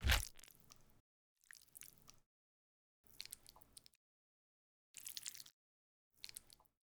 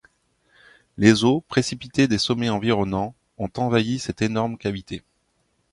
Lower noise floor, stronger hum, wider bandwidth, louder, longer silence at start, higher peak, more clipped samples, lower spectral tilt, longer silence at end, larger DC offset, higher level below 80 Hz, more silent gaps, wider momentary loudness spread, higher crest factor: about the same, -66 dBFS vs -69 dBFS; neither; first, over 20 kHz vs 11.5 kHz; second, -48 LUFS vs -22 LUFS; second, 0 s vs 1 s; second, -18 dBFS vs -2 dBFS; neither; second, -2 dB/octave vs -5.5 dB/octave; second, 0.45 s vs 0.75 s; neither; about the same, -54 dBFS vs -50 dBFS; first, 1.00-1.36 s, 2.26-3.04 s, 3.97-4.94 s, 5.53-6.11 s vs none; first, 17 LU vs 14 LU; first, 32 dB vs 22 dB